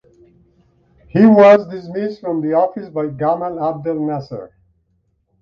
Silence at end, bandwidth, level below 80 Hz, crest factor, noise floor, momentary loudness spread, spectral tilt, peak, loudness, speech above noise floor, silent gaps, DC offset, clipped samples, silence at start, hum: 0.95 s; 6.6 kHz; -56 dBFS; 16 dB; -64 dBFS; 16 LU; -9 dB/octave; 0 dBFS; -15 LUFS; 49 dB; none; under 0.1%; under 0.1%; 1.15 s; none